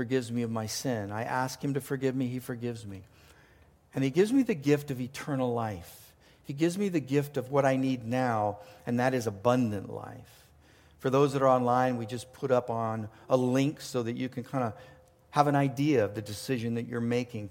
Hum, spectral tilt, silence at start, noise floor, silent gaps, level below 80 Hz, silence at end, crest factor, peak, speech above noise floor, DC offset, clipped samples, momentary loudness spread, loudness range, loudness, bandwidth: none; -6.5 dB/octave; 0 s; -60 dBFS; none; -66 dBFS; 0 s; 22 dB; -8 dBFS; 31 dB; under 0.1%; under 0.1%; 12 LU; 3 LU; -30 LUFS; 17 kHz